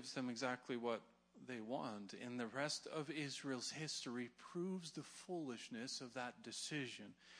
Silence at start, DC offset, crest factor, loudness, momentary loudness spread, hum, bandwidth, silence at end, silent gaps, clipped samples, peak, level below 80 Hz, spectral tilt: 0 s; under 0.1%; 20 dB; -47 LUFS; 7 LU; none; 10.5 kHz; 0 s; none; under 0.1%; -28 dBFS; under -90 dBFS; -3.5 dB/octave